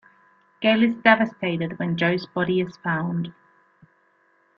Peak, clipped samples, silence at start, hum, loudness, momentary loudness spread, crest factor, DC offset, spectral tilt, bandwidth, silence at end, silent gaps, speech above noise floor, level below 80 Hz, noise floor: -2 dBFS; under 0.1%; 0.6 s; none; -22 LUFS; 9 LU; 22 dB; under 0.1%; -8 dB/octave; 6.6 kHz; 1.25 s; none; 41 dB; -64 dBFS; -63 dBFS